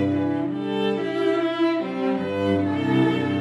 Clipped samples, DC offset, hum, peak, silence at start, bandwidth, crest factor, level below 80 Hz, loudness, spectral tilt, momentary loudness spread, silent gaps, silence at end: under 0.1%; under 0.1%; none; -10 dBFS; 0 s; 9.8 kHz; 12 dB; -64 dBFS; -23 LUFS; -7.5 dB/octave; 4 LU; none; 0 s